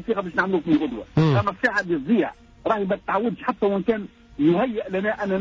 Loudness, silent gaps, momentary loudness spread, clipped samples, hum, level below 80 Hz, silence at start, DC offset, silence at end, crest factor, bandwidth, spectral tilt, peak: -23 LUFS; none; 6 LU; under 0.1%; none; -50 dBFS; 0 s; under 0.1%; 0 s; 14 dB; 7.6 kHz; -8 dB/octave; -8 dBFS